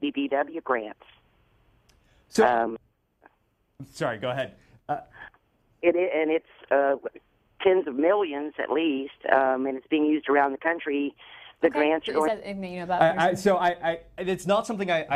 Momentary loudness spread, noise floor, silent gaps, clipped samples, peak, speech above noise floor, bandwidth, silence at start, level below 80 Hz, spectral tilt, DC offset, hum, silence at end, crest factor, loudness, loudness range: 12 LU; -70 dBFS; none; under 0.1%; -4 dBFS; 45 dB; 14 kHz; 0 s; -64 dBFS; -5.5 dB/octave; under 0.1%; none; 0 s; 22 dB; -26 LUFS; 5 LU